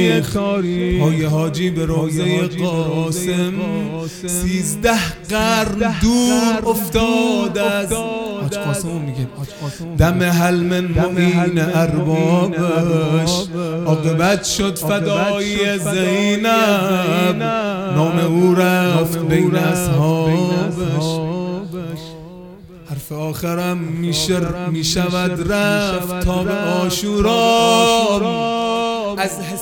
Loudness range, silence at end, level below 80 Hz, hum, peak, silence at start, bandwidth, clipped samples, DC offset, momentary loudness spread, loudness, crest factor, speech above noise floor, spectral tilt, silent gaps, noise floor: 4 LU; 0 s; -36 dBFS; none; 0 dBFS; 0 s; 18.5 kHz; under 0.1%; under 0.1%; 9 LU; -17 LUFS; 16 dB; 21 dB; -5 dB/octave; none; -37 dBFS